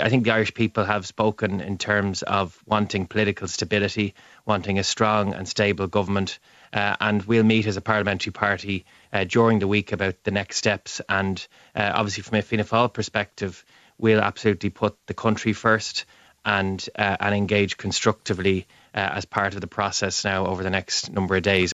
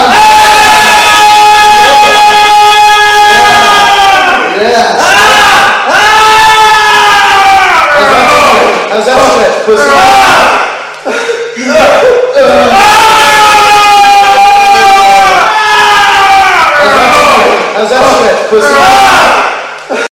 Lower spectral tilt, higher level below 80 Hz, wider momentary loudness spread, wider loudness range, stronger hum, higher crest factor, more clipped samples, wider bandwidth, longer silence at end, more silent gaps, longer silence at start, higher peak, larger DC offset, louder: first, -4.5 dB/octave vs -1.5 dB/octave; second, -56 dBFS vs -36 dBFS; first, 8 LU vs 5 LU; about the same, 2 LU vs 3 LU; neither; first, 20 dB vs 4 dB; second, under 0.1% vs 10%; second, 8 kHz vs over 20 kHz; about the same, 0 s vs 0.05 s; neither; about the same, 0 s vs 0 s; about the same, -2 dBFS vs 0 dBFS; neither; second, -23 LUFS vs -3 LUFS